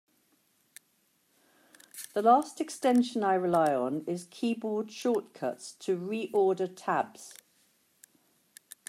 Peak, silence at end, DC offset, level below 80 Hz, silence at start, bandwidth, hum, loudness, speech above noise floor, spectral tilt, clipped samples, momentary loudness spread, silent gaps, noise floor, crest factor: -10 dBFS; 1.55 s; under 0.1%; -82 dBFS; 1.95 s; 16 kHz; none; -29 LUFS; 43 dB; -5 dB/octave; under 0.1%; 13 LU; none; -71 dBFS; 20 dB